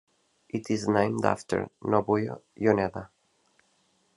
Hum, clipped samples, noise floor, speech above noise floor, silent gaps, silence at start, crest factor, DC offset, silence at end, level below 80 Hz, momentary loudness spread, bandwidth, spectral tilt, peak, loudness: none; under 0.1%; -69 dBFS; 42 dB; none; 0.55 s; 24 dB; under 0.1%; 1.1 s; -70 dBFS; 11 LU; 11.5 kHz; -6.5 dB/octave; -6 dBFS; -28 LUFS